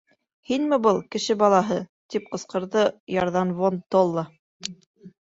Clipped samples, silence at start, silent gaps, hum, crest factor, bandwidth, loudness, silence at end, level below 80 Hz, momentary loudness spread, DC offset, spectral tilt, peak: under 0.1%; 0.5 s; 1.89-2.09 s, 3.00-3.07 s, 4.39-4.60 s, 4.86-4.94 s; none; 18 dB; 8 kHz; -23 LUFS; 0.15 s; -64 dBFS; 15 LU; under 0.1%; -5.5 dB/octave; -6 dBFS